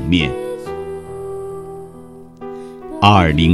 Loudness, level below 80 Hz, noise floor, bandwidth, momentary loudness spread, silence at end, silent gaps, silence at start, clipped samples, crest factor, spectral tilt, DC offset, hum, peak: -17 LUFS; -34 dBFS; -37 dBFS; 12.5 kHz; 23 LU; 0 s; none; 0 s; under 0.1%; 18 dB; -6.5 dB/octave; 0.2%; none; 0 dBFS